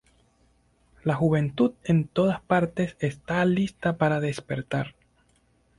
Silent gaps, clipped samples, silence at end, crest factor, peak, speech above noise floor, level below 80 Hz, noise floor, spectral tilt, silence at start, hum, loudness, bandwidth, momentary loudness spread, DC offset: none; under 0.1%; 0.9 s; 18 dB; -8 dBFS; 40 dB; -56 dBFS; -65 dBFS; -7.5 dB/octave; 1.05 s; none; -26 LUFS; 11.5 kHz; 8 LU; under 0.1%